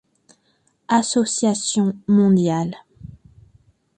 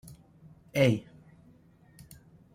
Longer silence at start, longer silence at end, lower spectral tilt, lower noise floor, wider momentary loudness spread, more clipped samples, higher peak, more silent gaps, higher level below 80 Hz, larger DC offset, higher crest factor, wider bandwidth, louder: first, 0.9 s vs 0.05 s; second, 0.9 s vs 1.55 s; second, -5 dB/octave vs -6.5 dB/octave; first, -64 dBFS vs -59 dBFS; second, 9 LU vs 27 LU; neither; first, -6 dBFS vs -12 dBFS; neither; first, -58 dBFS vs -64 dBFS; neither; second, 16 dB vs 22 dB; second, 9.8 kHz vs 16 kHz; first, -19 LUFS vs -28 LUFS